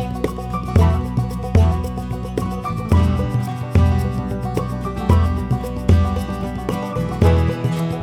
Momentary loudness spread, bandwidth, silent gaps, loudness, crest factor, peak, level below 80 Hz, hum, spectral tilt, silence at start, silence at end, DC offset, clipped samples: 8 LU; 13.5 kHz; none; -20 LUFS; 18 dB; 0 dBFS; -28 dBFS; none; -8 dB/octave; 0 s; 0 s; under 0.1%; under 0.1%